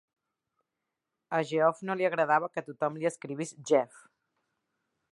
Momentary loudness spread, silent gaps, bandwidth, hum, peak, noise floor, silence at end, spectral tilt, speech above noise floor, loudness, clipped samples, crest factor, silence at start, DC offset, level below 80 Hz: 11 LU; none; 11.5 kHz; none; -12 dBFS; -86 dBFS; 1.25 s; -5 dB/octave; 57 dB; -30 LUFS; under 0.1%; 20 dB; 1.3 s; under 0.1%; -86 dBFS